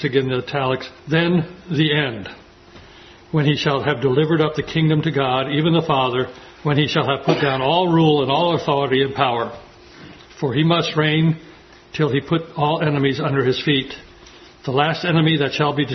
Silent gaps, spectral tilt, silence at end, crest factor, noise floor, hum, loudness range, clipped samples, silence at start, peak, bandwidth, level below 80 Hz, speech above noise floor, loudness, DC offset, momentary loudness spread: none; -7 dB/octave; 0 s; 18 dB; -44 dBFS; none; 3 LU; under 0.1%; 0 s; 0 dBFS; 6.4 kHz; -52 dBFS; 26 dB; -19 LUFS; under 0.1%; 8 LU